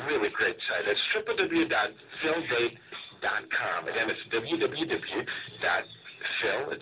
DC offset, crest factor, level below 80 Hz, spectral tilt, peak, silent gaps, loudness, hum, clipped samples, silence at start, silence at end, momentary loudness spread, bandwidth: under 0.1%; 18 dB; -66 dBFS; -1 dB/octave; -12 dBFS; none; -29 LUFS; none; under 0.1%; 0 s; 0 s; 7 LU; 4 kHz